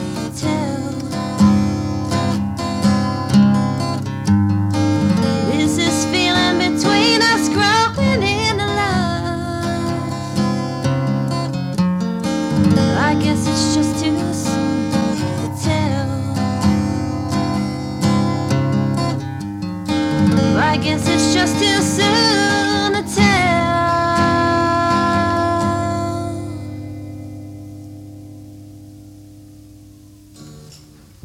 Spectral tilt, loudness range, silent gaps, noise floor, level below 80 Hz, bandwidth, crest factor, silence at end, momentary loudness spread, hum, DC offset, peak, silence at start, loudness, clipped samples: -5 dB/octave; 6 LU; none; -43 dBFS; -40 dBFS; 15.5 kHz; 16 dB; 0.5 s; 10 LU; none; under 0.1%; -2 dBFS; 0 s; -17 LUFS; under 0.1%